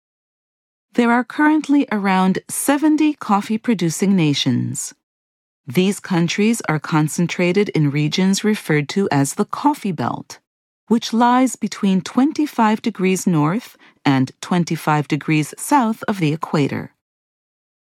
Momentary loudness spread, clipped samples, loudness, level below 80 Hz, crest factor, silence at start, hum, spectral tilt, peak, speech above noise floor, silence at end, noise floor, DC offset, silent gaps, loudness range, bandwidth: 6 LU; under 0.1%; -18 LUFS; -68 dBFS; 16 dB; 0.95 s; none; -5.5 dB/octave; -2 dBFS; over 72 dB; 1.1 s; under -90 dBFS; under 0.1%; 5.03-5.64 s, 10.47-10.87 s; 2 LU; 16 kHz